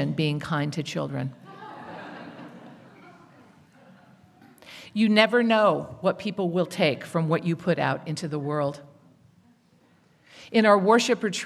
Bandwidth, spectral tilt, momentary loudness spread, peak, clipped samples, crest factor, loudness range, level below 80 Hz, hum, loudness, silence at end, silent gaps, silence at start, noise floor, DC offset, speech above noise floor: 13.5 kHz; -5.5 dB/octave; 23 LU; -4 dBFS; under 0.1%; 22 dB; 17 LU; -70 dBFS; none; -24 LUFS; 0 s; none; 0 s; -61 dBFS; under 0.1%; 37 dB